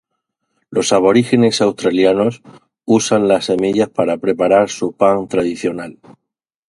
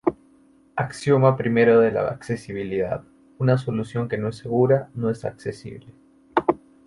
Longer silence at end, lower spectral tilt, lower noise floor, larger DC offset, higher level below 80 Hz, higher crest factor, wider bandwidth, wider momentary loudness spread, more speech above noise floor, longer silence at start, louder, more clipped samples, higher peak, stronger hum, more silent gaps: first, 0.75 s vs 0.3 s; second, -5 dB/octave vs -8 dB/octave; first, -79 dBFS vs -56 dBFS; neither; about the same, -54 dBFS vs -56 dBFS; about the same, 16 dB vs 20 dB; about the same, 11.5 kHz vs 11.5 kHz; second, 9 LU vs 14 LU; first, 64 dB vs 34 dB; first, 0.7 s vs 0.05 s; first, -15 LUFS vs -23 LUFS; neither; about the same, 0 dBFS vs -2 dBFS; neither; neither